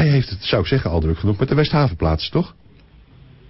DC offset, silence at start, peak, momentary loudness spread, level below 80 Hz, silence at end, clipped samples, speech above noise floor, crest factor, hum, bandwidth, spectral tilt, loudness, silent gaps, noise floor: under 0.1%; 0 s; -6 dBFS; 5 LU; -32 dBFS; 1 s; under 0.1%; 29 dB; 14 dB; none; 5.8 kHz; -10 dB/octave; -19 LUFS; none; -47 dBFS